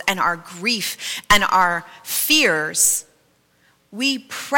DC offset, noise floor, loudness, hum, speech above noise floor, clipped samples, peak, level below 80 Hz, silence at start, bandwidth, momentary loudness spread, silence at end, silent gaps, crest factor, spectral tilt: under 0.1%; -60 dBFS; -18 LUFS; none; 40 dB; under 0.1%; -4 dBFS; -44 dBFS; 0 s; 17 kHz; 11 LU; 0 s; none; 16 dB; -1 dB/octave